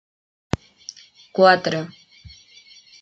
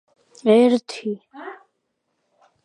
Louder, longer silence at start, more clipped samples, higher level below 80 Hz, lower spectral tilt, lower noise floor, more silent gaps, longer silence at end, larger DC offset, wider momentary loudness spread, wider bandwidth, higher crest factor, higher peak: about the same, -20 LUFS vs -19 LUFS; first, 1.35 s vs 0.45 s; neither; first, -52 dBFS vs -78 dBFS; about the same, -5 dB/octave vs -6 dB/octave; second, -49 dBFS vs -74 dBFS; neither; second, 0.75 s vs 1.1 s; neither; about the same, 24 LU vs 23 LU; second, 8 kHz vs 10.5 kHz; about the same, 22 dB vs 18 dB; about the same, -2 dBFS vs -4 dBFS